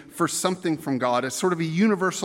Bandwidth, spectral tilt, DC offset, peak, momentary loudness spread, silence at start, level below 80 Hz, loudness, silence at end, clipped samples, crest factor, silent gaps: 16.5 kHz; -4.5 dB/octave; under 0.1%; -6 dBFS; 4 LU; 0 s; -70 dBFS; -24 LUFS; 0 s; under 0.1%; 18 dB; none